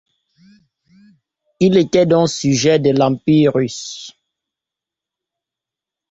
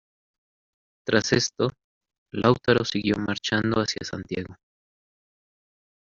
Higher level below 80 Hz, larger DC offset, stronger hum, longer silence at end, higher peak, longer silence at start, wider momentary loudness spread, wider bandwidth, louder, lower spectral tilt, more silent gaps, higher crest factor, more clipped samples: about the same, -54 dBFS vs -58 dBFS; neither; neither; first, 2 s vs 1.5 s; about the same, -2 dBFS vs -4 dBFS; first, 1.6 s vs 1.05 s; first, 15 LU vs 12 LU; about the same, 8 kHz vs 7.6 kHz; first, -15 LUFS vs -24 LUFS; first, -5.5 dB/octave vs -4 dB/octave; second, none vs 1.84-2.01 s, 2.18-2.26 s; second, 16 dB vs 22 dB; neither